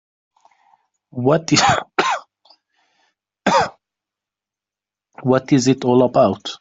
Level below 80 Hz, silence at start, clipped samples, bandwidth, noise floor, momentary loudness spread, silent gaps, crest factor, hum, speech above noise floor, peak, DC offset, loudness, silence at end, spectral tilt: -56 dBFS; 1.15 s; under 0.1%; 7.8 kHz; -88 dBFS; 10 LU; none; 18 dB; none; 73 dB; -2 dBFS; under 0.1%; -17 LUFS; 0.05 s; -4.5 dB/octave